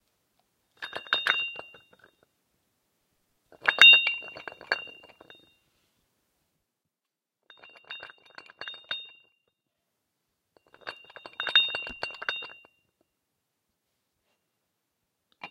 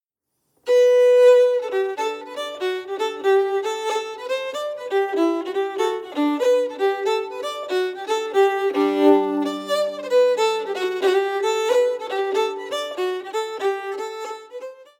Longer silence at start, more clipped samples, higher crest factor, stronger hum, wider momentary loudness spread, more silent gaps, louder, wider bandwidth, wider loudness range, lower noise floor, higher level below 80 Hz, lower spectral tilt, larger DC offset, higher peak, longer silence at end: first, 0.8 s vs 0.65 s; neither; first, 32 dB vs 16 dB; neither; first, 28 LU vs 11 LU; neither; about the same, -22 LUFS vs -21 LUFS; about the same, 16 kHz vs 16 kHz; first, 21 LU vs 5 LU; first, -88 dBFS vs -76 dBFS; about the same, -74 dBFS vs -78 dBFS; second, 0.5 dB/octave vs -3 dB/octave; neither; first, 0 dBFS vs -4 dBFS; about the same, 0.05 s vs 0.15 s